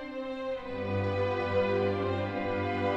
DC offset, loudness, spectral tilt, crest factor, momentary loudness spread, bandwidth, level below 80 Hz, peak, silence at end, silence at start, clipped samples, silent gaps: under 0.1%; -31 LUFS; -8 dB/octave; 14 dB; 7 LU; 7.8 kHz; -58 dBFS; -18 dBFS; 0 s; 0 s; under 0.1%; none